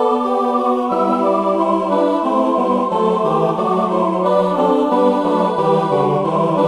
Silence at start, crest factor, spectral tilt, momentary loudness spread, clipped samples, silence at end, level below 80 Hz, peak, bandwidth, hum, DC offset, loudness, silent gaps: 0 s; 12 dB; -8 dB/octave; 2 LU; under 0.1%; 0 s; -58 dBFS; -2 dBFS; 11.5 kHz; none; under 0.1%; -16 LUFS; none